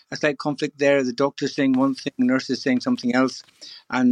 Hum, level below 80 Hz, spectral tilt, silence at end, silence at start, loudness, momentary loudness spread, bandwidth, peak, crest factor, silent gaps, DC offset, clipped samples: none; -74 dBFS; -5 dB/octave; 0 s; 0.1 s; -22 LUFS; 7 LU; 9.4 kHz; -4 dBFS; 18 dB; none; under 0.1%; under 0.1%